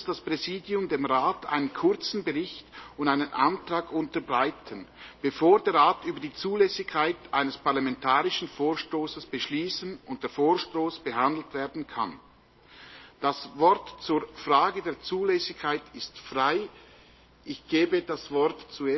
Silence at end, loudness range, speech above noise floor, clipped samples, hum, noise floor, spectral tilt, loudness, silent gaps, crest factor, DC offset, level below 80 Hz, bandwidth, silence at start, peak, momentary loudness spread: 0 s; 4 LU; 29 dB; under 0.1%; none; -56 dBFS; -5 dB/octave; -27 LUFS; none; 20 dB; under 0.1%; -62 dBFS; 6.2 kHz; 0 s; -8 dBFS; 12 LU